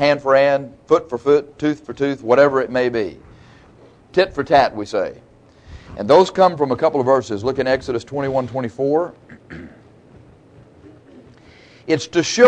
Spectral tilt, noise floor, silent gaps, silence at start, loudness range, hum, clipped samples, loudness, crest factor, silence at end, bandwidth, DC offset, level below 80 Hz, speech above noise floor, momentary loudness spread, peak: -5 dB/octave; -47 dBFS; none; 0 s; 9 LU; none; under 0.1%; -18 LUFS; 18 dB; 0 s; 9.4 kHz; under 0.1%; -50 dBFS; 30 dB; 14 LU; 0 dBFS